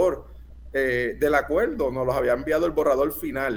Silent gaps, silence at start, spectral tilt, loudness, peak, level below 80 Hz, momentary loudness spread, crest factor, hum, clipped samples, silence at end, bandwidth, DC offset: none; 0 s; -6 dB/octave; -24 LUFS; -6 dBFS; -42 dBFS; 5 LU; 18 dB; none; under 0.1%; 0 s; over 20 kHz; under 0.1%